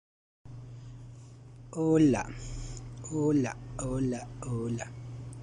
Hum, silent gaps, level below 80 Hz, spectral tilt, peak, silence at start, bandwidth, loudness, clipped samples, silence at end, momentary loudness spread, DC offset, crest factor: none; none; -50 dBFS; -7 dB/octave; -14 dBFS; 0.45 s; 10.5 kHz; -31 LUFS; under 0.1%; 0 s; 23 LU; under 0.1%; 18 dB